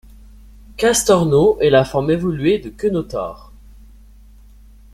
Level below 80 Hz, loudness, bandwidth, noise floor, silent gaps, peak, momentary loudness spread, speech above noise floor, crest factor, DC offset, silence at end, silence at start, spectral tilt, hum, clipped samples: -40 dBFS; -16 LUFS; 14 kHz; -43 dBFS; none; -2 dBFS; 13 LU; 28 dB; 16 dB; under 0.1%; 1.55 s; 0.75 s; -5 dB/octave; none; under 0.1%